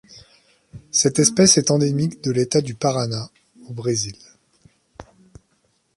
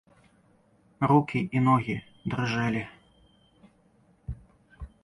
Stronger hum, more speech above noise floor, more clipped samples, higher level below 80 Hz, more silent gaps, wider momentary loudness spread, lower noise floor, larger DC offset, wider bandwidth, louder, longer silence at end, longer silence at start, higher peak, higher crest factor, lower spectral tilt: neither; first, 46 dB vs 37 dB; neither; about the same, -56 dBFS vs -52 dBFS; neither; second, 16 LU vs 22 LU; about the same, -66 dBFS vs -63 dBFS; neither; about the same, 11.5 kHz vs 11 kHz; first, -19 LUFS vs -27 LUFS; first, 0.95 s vs 0.15 s; second, 0.1 s vs 1 s; first, -2 dBFS vs -8 dBFS; about the same, 20 dB vs 22 dB; second, -4 dB/octave vs -7.5 dB/octave